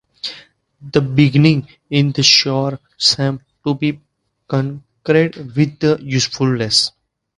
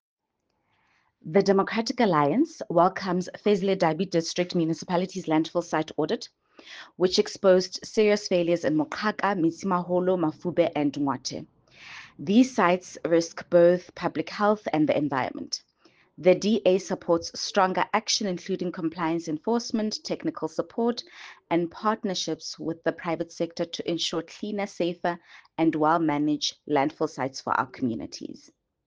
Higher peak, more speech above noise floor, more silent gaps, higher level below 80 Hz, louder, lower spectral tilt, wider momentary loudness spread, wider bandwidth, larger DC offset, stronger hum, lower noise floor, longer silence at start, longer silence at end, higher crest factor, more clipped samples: first, 0 dBFS vs -6 dBFS; second, 29 dB vs 52 dB; neither; first, -52 dBFS vs -68 dBFS; first, -16 LUFS vs -26 LUFS; about the same, -4.5 dB/octave vs -5 dB/octave; first, 13 LU vs 10 LU; first, 11.5 kHz vs 9.8 kHz; neither; neither; second, -44 dBFS vs -77 dBFS; second, 0.25 s vs 1.25 s; about the same, 0.5 s vs 0.5 s; about the same, 18 dB vs 20 dB; neither